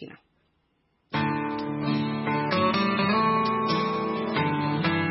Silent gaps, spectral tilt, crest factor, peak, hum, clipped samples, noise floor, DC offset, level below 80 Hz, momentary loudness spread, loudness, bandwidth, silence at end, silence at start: none; -9.5 dB/octave; 16 dB; -10 dBFS; none; under 0.1%; -71 dBFS; under 0.1%; -62 dBFS; 6 LU; -25 LUFS; 5.8 kHz; 0 s; 0 s